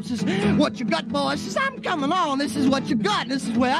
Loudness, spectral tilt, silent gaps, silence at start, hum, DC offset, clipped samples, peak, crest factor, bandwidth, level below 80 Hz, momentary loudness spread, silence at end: -23 LUFS; -5 dB/octave; none; 0 s; none; under 0.1%; under 0.1%; -8 dBFS; 14 dB; 13.5 kHz; -56 dBFS; 4 LU; 0 s